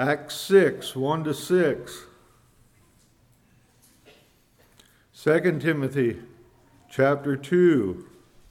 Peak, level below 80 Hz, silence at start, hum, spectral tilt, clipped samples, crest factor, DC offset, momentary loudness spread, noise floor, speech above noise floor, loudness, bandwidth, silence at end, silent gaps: -6 dBFS; -62 dBFS; 0 s; none; -6 dB/octave; under 0.1%; 20 dB; under 0.1%; 15 LU; -60 dBFS; 38 dB; -23 LUFS; 16.5 kHz; 0.45 s; none